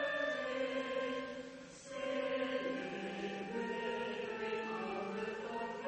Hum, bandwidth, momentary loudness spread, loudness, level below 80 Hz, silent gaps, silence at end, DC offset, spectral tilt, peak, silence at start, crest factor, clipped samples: none; 8.4 kHz; 6 LU; -40 LUFS; -74 dBFS; none; 0 s; under 0.1%; -4.5 dB/octave; -26 dBFS; 0 s; 14 dB; under 0.1%